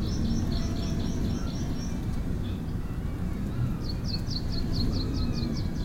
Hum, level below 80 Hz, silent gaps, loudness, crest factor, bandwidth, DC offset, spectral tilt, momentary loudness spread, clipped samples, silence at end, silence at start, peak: none; -32 dBFS; none; -31 LUFS; 12 dB; 16 kHz; under 0.1%; -6.5 dB/octave; 4 LU; under 0.1%; 0 s; 0 s; -16 dBFS